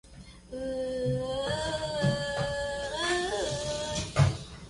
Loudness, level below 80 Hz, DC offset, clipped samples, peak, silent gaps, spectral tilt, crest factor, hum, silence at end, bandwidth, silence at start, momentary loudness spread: -30 LUFS; -46 dBFS; under 0.1%; under 0.1%; -10 dBFS; none; -4.5 dB/octave; 20 dB; none; 0 s; 11.5 kHz; 0.05 s; 8 LU